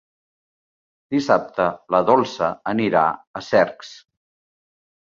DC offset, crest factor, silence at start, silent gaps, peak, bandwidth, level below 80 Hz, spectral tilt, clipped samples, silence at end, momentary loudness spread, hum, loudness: under 0.1%; 20 dB; 1.1 s; 3.27-3.34 s; -2 dBFS; 7.6 kHz; -60 dBFS; -6 dB/octave; under 0.1%; 1.1 s; 8 LU; none; -20 LUFS